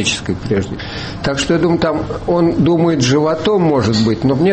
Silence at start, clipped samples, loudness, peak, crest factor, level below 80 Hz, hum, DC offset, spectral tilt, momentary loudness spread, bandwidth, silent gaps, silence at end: 0 s; under 0.1%; -15 LUFS; -4 dBFS; 10 dB; -36 dBFS; none; under 0.1%; -5.5 dB/octave; 7 LU; 8.8 kHz; none; 0 s